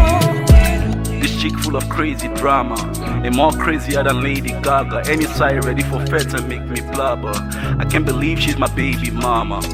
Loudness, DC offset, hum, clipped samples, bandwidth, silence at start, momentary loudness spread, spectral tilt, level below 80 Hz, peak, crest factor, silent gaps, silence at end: -17 LUFS; under 0.1%; none; under 0.1%; 16.5 kHz; 0 s; 7 LU; -5.5 dB/octave; -22 dBFS; 0 dBFS; 16 dB; none; 0 s